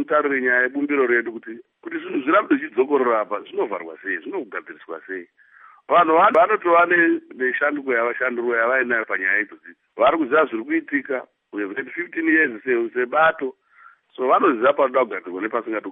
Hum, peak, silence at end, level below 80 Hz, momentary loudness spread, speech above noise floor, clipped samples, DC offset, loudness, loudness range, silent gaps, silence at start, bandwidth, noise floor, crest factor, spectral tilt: none; -4 dBFS; 0 s; -68 dBFS; 16 LU; 31 dB; under 0.1%; under 0.1%; -20 LUFS; 5 LU; none; 0 s; 3.8 kHz; -51 dBFS; 16 dB; -7.5 dB/octave